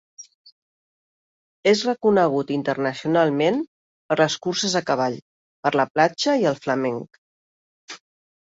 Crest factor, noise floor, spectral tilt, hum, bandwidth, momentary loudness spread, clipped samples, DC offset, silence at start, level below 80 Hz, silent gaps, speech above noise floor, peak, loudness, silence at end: 20 dB; under -90 dBFS; -4.5 dB/octave; none; 8 kHz; 15 LU; under 0.1%; under 0.1%; 0.2 s; -66 dBFS; 0.35-0.45 s, 0.52-1.63 s, 3.68-4.09 s, 5.22-5.63 s, 5.90-5.95 s, 7.18-7.88 s; over 69 dB; -4 dBFS; -21 LUFS; 0.5 s